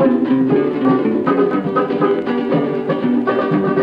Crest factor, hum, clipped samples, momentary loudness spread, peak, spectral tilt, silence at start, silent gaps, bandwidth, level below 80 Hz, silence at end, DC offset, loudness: 12 dB; none; under 0.1%; 3 LU; -4 dBFS; -9.5 dB/octave; 0 s; none; 5.2 kHz; -58 dBFS; 0 s; under 0.1%; -16 LUFS